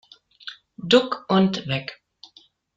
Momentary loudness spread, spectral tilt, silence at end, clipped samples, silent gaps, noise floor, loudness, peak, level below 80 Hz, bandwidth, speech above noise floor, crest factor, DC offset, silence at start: 20 LU; -6 dB/octave; 0.8 s; under 0.1%; none; -56 dBFS; -21 LUFS; -2 dBFS; -64 dBFS; 7.8 kHz; 35 dB; 22 dB; under 0.1%; 0.45 s